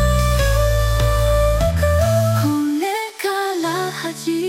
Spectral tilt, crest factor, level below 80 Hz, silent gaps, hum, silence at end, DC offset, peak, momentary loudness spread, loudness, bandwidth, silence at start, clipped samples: -5.5 dB/octave; 12 dB; -22 dBFS; none; none; 0 s; under 0.1%; -6 dBFS; 6 LU; -18 LUFS; 16.5 kHz; 0 s; under 0.1%